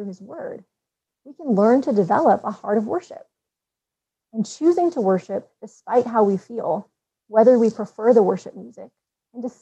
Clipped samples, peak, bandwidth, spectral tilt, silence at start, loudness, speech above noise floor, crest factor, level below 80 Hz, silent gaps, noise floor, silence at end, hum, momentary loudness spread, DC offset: under 0.1%; -4 dBFS; 8.4 kHz; -7.5 dB/octave; 0 s; -20 LUFS; 66 dB; 18 dB; -74 dBFS; none; -86 dBFS; 0.1 s; none; 18 LU; under 0.1%